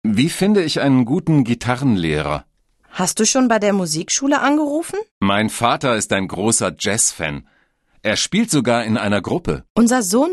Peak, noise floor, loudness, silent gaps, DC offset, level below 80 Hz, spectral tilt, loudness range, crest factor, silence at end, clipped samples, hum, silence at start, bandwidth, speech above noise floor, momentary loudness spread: -2 dBFS; -58 dBFS; -17 LUFS; 5.11-5.21 s, 9.70-9.75 s; under 0.1%; -44 dBFS; -4 dB/octave; 1 LU; 16 dB; 0 s; under 0.1%; none; 0.05 s; 13 kHz; 41 dB; 7 LU